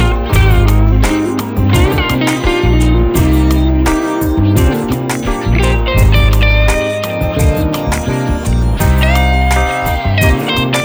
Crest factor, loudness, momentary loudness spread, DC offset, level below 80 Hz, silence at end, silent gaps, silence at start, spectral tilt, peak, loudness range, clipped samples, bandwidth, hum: 10 dB; -12 LUFS; 5 LU; under 0.1%; -14 dBFS; 0 s; none; 0 s; -6 dB/octave; 0 dBFS; 1 LU; under 0.1%; over 20 kHz; none